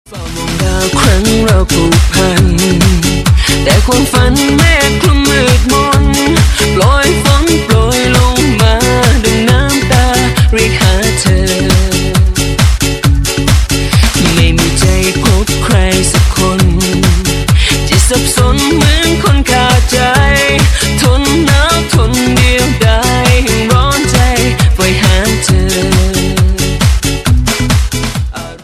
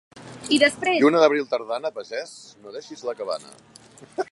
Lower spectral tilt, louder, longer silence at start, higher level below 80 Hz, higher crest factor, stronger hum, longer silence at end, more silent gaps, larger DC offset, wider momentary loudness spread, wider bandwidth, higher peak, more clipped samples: about the same, -4.5 dB/octave vs -3.5 dB/octave; first, -9 LUFS vs -22 LUFS; about the same, 0.1 s vs 0.15 s; first, -14 dBFS vs -70 dBFS; second, 8 dB vs 20 dB; neither; about the same, 0.05 s vs 0.1 s; neither; neither; second, 3 LU vs 21 LU; first, 14.5 kHz vs 11.5 kHz; about the same, 0 dBFS vs -2 dBFS; first, 0.8% vs under 0.1%